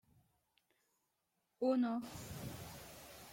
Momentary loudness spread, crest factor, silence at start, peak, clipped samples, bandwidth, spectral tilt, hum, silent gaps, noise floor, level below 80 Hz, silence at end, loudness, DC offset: 18 LU; 20 dB; 1.6 s; -24 dBFS; under 0.1%; 16.5 kHz; -6 dB/octave; none; none; -85 dBFS; -70 dBFS; 0 s; -40 LUFS; under 0.1%